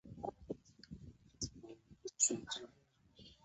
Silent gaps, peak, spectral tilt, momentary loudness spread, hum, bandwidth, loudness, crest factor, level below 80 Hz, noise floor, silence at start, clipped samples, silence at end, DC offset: none; -18 dBFS; -4 dB/octave; 25 LU; none; 8 kHz; -40 LUFS; 28 dB; -66 dBFS; -65 dBFS; 0.05 s; under 0.1%; 0.1 s; under 0.1%